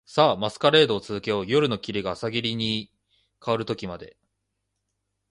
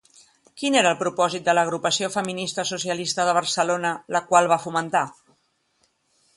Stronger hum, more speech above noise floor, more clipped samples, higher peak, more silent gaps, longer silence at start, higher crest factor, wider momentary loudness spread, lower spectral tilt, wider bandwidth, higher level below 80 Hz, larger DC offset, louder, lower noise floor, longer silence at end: first, 50 Hz at -55 dBFS vs none; first, 55 dB vs 46 dB; neither; about the same, -4 dBFS vs -2 dBFS; neither; second, 0.1 s vs 0.55 s; about the same, 22 dB vs 22 dB; first, 12 LU vs 7 LU; first, -5.5 dB/octave vs -3 dB/octave; about the same, 11 kHz vs 11.5 kHz; first, -58 dBFS vs -70 dBFS; neither; about the same, -24 LUFS vs -22 LUFS; first, -79 dBFS vs -68 dBFS; about the same, 1.25 s vs 1.25 s